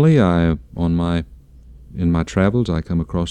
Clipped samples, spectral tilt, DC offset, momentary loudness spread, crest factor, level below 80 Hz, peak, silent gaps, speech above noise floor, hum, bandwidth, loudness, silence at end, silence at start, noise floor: under 0.1%; -8 dB/octave; under 0.1%; 9 LU; 14 dB; -34 dBFS; -4 dBFS; none; 25 dB; none; 9 kHz; -19 LUFS; 0 s; 0 s; -42 dBFS